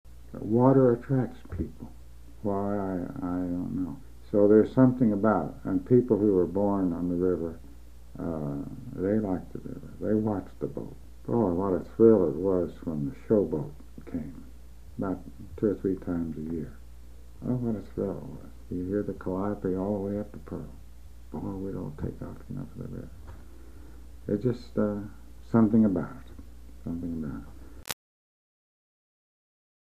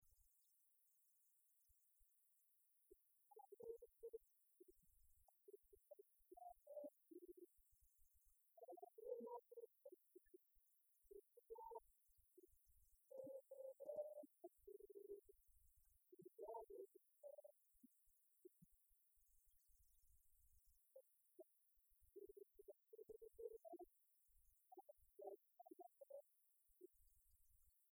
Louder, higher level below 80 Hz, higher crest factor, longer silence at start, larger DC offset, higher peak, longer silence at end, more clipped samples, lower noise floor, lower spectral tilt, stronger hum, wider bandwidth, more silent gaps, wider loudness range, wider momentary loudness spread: first, -28 LUFS vs -62 LUFS; first, -50 dBFS vs -86 dBFS; about the same, 22 dB vs 24 dB; about the same, 0.05 s vs 0 s; first, 0.5% vs under 0.1%; first, -6 dBFS vs -42 dBFS; first, 1.9 s vs 0.05 s; neither; second, -48 dBFS vs -82 dBFS; first, -9 dB/octave vs -6 dB/octave; neither; second, 15.5 kHz vs over 20 kHz; neither; first, 11 LU vs 6 LU; first, 21 LU vs 12 LU